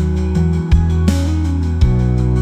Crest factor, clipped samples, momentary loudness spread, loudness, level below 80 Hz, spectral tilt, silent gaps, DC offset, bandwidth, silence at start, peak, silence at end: 12 dB; under 0.1%; 3 LU; -16 LUFS; -18 dBFS; -8 dB/octave; none; under 0.1%; 9.8 kHz; 0 s; -2 dBFS; 0 s